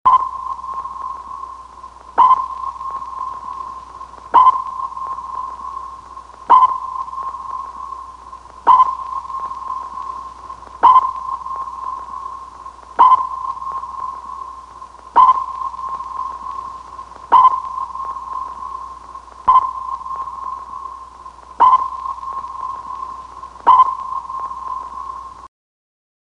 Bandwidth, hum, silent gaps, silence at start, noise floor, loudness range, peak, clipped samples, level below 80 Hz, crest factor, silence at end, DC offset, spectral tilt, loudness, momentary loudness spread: 9 kHz; none; none; 0.05 s; -38 dBFS; 4 LU; 0 dBFS; under 0.1%; -50 dBFS; 18 dB; 0.75 s; under 0.1%; -4 dB/octave; -17 LUFS; 23 LU